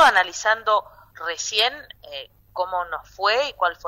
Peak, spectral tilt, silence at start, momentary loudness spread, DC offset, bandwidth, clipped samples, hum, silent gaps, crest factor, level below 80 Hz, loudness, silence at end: -6 dBFS; 0.5 dB/octave; 0 s; 16 LU; under 0.1%; 16 kHz; under 0.1%; none; none; 18 dB; -56 dBFS; -22 LUFS; 0 s